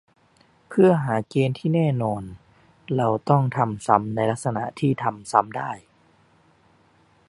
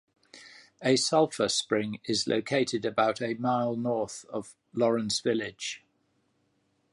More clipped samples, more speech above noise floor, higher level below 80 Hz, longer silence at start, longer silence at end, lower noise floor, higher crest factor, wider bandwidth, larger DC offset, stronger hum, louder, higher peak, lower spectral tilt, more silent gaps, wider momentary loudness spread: neither; second, 37 dB vs 44 dB; first, -58 dBFS vs -70 dBFS; first, 0.7 s vs 0.35 s; first, 1.5 s vs 1.15 s; second, -59 dBFS vs -72 dBFS; about the same, 22 dB vs 18 dB; about the same, 11.5 kHz vs 11.5 kHz; neither; neither; first, -23 LUFS vs -28 LUFS; first, -2 dBFS vs -10 dBFS; first, -7.5 dB/octave vs -4 dB/octave; neither; about the same, 11 LU vs 12 LU